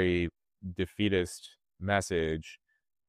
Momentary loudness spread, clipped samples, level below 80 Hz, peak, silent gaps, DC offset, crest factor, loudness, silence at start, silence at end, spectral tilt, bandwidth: 17 LU; under 0.1%; -52 dBFS; -14 dBFS; none; under 0.1%; 20 dB; -32 LUFS; 0 s; 0.55 s; -5.5 dB/octave; 15 kHz